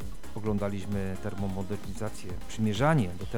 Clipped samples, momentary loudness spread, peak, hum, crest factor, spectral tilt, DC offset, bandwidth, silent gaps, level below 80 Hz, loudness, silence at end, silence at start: under 0.1%; 12 LU; -12 dBFS; none; 20 dB; -6.5 dB/octave; 2%; 19 kHz; none; -46 dBFS; -31 LUFS; 0 s; 0 s